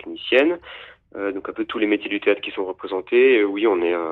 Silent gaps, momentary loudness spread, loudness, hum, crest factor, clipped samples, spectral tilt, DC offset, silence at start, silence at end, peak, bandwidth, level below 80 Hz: none; 13 LU; -21 LUFS; none; 18 dB; under 0.1%; -6 dB/octave; under 0.1%; 0.05 s; 0 s; -4 dBFS; 4.4 kHz; -62 dBFS